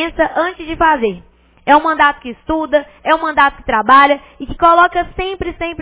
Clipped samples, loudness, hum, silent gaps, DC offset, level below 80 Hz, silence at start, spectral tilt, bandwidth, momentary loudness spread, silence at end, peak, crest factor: 0.1%; -13 LUFS; none; none; under 0.1%; -38 dBFS; 0 s; -8 dB/octave; 4 kHz; 12 LU; 0 s; 0 dBFS; 14 dB